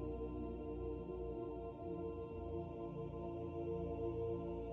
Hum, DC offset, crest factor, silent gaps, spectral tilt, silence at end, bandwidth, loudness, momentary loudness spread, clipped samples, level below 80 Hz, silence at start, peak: none; under 0.1%; 14 dB; none; -9.5 dB/octave; 0 s; 4 kHz; -46 LUFS; 4 LU; under 0.1%; -54 dBFS; 0 s; -32 dBFS